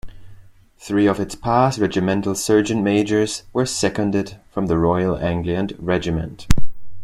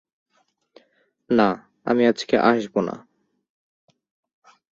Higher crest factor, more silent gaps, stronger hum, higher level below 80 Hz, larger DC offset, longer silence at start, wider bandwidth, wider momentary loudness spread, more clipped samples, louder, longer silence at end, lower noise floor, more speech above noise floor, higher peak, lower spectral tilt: about the same, 18 dB vs 22 dB; neither; neither; first, -36 dBFS vs -64 dBFS; neither; second, 0.05 s vs 1.3 s; first, 13.5 kHz vs 7.4 kHz; second, 6 LU vs 12 LU; neither; about the same, -20 LUFS vs -21 LUFS; second, 0 s vs 1.75 s; second, -46 dBFS vs -68 dBFS; second, 27 dB vs 48 dB; about the same, -2 dBFS vs -4 dBFS; about the same, -5.5 dB/octave vs -6 dB/octave